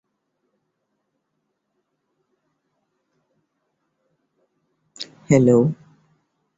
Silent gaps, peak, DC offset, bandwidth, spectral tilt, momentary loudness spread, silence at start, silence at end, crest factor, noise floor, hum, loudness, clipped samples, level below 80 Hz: none; -2 dBFS; under 0.1%; 8 kHz; -7 dB/octave; 21 LU; 5 s; 0.85 s; 24 dB; -75 dBFS; none; -17 LUFS; under 0.1%; -62 dBFS